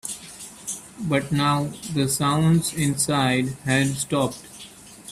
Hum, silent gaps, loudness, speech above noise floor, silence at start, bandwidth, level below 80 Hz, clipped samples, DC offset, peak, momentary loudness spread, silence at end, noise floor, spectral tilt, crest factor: none; none; -23 LUFS; 22 dB; 0.05 s; 15 kHz; -54 dBFS; under 0.1%; under 0.1%; -6 dBFS; 18 LU; 0 s; -44 dBFS; -4.5 dB/octave; 18 dB